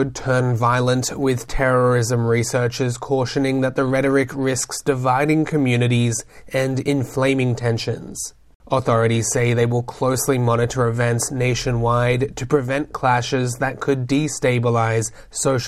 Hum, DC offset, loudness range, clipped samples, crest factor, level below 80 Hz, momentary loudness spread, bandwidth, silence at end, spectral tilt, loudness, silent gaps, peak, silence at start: none; under 0.1%; 1 LU; under 0.1%; 16 dB; -42 dBFS; 5 LU; 15 kHz; 0 s; -5.5 dB/octave; -20 LUFS; 8.55-8.60 s; -4 dBFS; 0 s